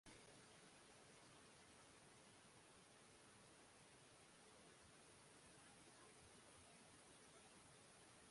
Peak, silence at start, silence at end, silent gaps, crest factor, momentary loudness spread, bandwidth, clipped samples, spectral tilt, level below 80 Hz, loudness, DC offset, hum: -52 dBFS; 0.05 s; 0 s; none; 16 dB; 2 LU; 11.5 kHz; under 0.1%; -2.5 dB/octave; -86 dBFS; -66 LUFS; under 0.1%; none